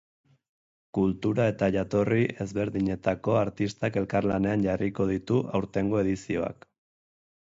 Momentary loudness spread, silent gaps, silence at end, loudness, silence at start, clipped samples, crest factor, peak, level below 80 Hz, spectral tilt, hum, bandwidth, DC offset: 5 LU; none; 0.9 s; -27 LUFS; 0.95 s; under 0.1%; 18 dB; -10 dBFS; -52 dBFS; -7.5 dB/octave; none; 7.8 kHz; under 0.1%